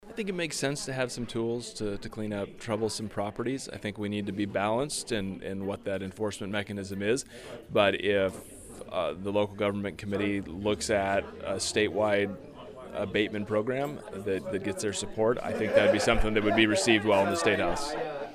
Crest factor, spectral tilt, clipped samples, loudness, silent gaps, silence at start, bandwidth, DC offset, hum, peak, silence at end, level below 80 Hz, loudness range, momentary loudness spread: 22 dB; -4.5 dB/octave; under 0.1%; -29 LUFS; none; 0 s; 15.5 kHz; under 0.1%; none; -8 dBFS; 0 s; -46 dBFS; 7 LU; 12 LU